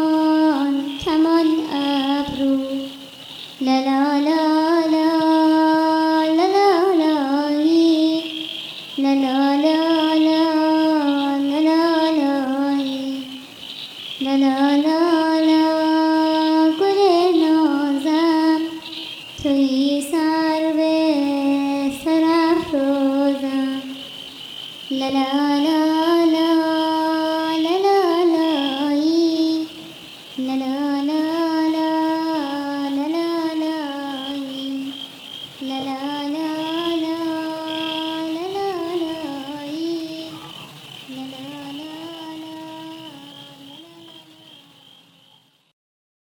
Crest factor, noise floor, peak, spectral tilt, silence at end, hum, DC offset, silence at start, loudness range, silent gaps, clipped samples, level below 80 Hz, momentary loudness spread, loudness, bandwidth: 14 dB; -56 dBFS; -4 dBFS; -4.5 dB/octave; 2.05 s; none; under 0.1%; 0 s; 11 LU; none; under 0.1%; -60 dBFS; 16 LU; -19 LUFS; 15.5 kHz